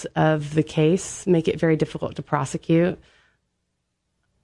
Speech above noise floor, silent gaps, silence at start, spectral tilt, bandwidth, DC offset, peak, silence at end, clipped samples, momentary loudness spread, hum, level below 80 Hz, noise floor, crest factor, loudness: 54 dB; none; 0 s; -6.5 dB/octave; 11.5 kHz; under 0.1%; -6 dBFS; 1.45 s; under 0.1%; 6 LU; none; -54 dBFS; -75 dBFS; 16 dB; -22 LUFS